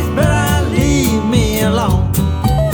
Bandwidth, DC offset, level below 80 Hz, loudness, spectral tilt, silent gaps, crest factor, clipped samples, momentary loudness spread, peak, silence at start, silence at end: over 20 kHz; under 0.1%; -22 dBFS; -14 LUFS; -5.5 dB/octave; none; 12 dB; under 0.1%; 2 LU; 0 dBFS; 0 s; 0 s